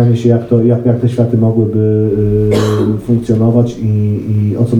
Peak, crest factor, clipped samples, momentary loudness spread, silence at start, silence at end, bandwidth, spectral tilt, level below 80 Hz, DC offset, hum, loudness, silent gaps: -2 dBFS; 8 dB; under 0.1%; 4 LU; 0 s; 0 s; 10.5 kHz; -9 dB/octave; -36 dBFS; under 0.1%; none; -12 LUFS; none